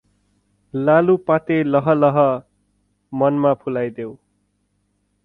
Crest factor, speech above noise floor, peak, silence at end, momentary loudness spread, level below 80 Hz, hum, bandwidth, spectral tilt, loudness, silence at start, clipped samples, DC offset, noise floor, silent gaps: 18 dB; 50 dB; -2 dBFS; 1.1 s; 15 LU; -60 dBFS; 50 Hz at -50 dBFS; 4.1 kHz; -10 dB/octave; -18 LUFS; 0.75 s; under 0.1%; under 0.1%; -67 dBFS; none